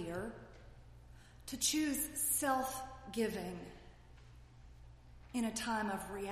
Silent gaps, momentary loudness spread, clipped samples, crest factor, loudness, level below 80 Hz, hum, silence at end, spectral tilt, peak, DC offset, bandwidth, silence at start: none; 21 LU; under 0.1%; 20 dB; -37 LUFS; -60 dBFS; none; 0 s; -2.5 dB/octave; -20 dBFS; under 0.1%; 15.5 kHz; 0 s